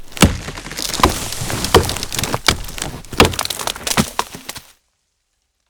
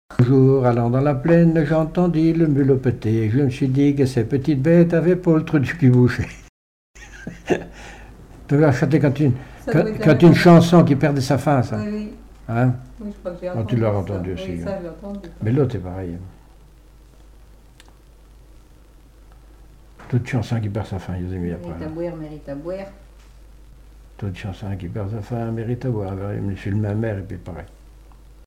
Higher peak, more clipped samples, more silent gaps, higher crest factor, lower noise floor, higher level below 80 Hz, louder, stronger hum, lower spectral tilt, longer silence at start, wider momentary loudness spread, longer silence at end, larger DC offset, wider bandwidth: about the same, 0 dBFS vs -2 dBFS; neither; second, none vs 6.49-6.94 s; about the same, 20 dB vs 18 dB; first, -69 dBFS vs -47 dBFS; first, -30 dBFS vs -42 dBFS; about the same, -17 LUFS vs -19 LUFS; neither; second, -3.5 dB/octave vs -8 dB/octave; about the same, 0 s vs 0.1 s; second, 13 LU vs 17 LU; first, 1.1 s vs 0.8 s; neither; first, over 20 kHz vs 12.5 kHz